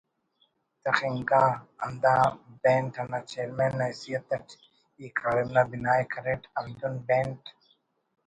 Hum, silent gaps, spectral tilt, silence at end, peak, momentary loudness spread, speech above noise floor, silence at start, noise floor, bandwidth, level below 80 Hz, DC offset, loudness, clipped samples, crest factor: none; none; -6.5 dB/octave; 0.8 s; -6 dBFS; 12 LU; 44 dB; 0.85 s; -71 dBFS; 10.5 kHz; -62 dBFS; under 0.1%; -28 LUFS; under 0.1%; 24 dB